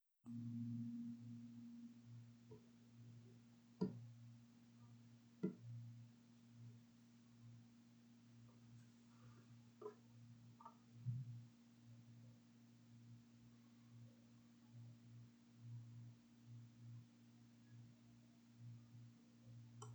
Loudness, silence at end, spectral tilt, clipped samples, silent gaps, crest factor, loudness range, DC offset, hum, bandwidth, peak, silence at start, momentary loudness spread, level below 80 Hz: -58 LUFS; 0 s; -8 dB/octave; under 0.1%; none; 28 dB; 11 LU; under 0.1%; none; over 20 kHz; -30 dBFS; 0.25 s; 18 LU; -90 dBFS